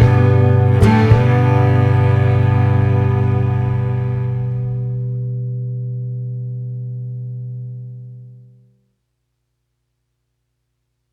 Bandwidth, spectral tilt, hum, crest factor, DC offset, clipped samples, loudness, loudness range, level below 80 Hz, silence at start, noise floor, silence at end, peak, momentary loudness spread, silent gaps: 5.6 kHz; -9 dB/octave; none; 16 dB; under 0.1%; under 0.1%; -16 LUFS; 19 LU; -36 dBFS; 0 s; -71 dBFS; 2.75 s; 0 dBFS; 16 LU; none